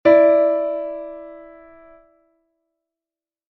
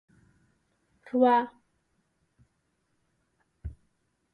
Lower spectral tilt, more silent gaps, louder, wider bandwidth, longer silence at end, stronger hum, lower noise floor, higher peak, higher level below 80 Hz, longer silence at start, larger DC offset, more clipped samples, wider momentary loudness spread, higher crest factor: about the same, -8 dB/octave vs -8 dB/octave; neither; first, -17 LUFS vs -25 LUFS; about the same, 4.7 kHz vs 4.7 kHz; first, 2.1 s vs 0.6 s; neither; first, under -90 dBFS vs -75 dBFS; first, -2 dBFS vs -10 dBFS; second, -62 dBFS vs -56 dBFS; second, 0.05 s vs 1.15 s; neither; neither; about the same, 24 LU vs 23 LU; about the same, 18 dB vs 22 dB